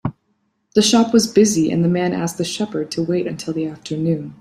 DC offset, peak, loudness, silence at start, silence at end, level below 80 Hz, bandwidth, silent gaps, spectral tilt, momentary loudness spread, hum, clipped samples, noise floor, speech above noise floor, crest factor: under 0.1%; -2 dBFS; -18 LUFS; 0.05 s; 0.05 s; -56 dBFS; 15 kHz; none; -5 dB/octave; 10 LU; none; under 0.1%; -67 dBFS; 50 dB; 16 dB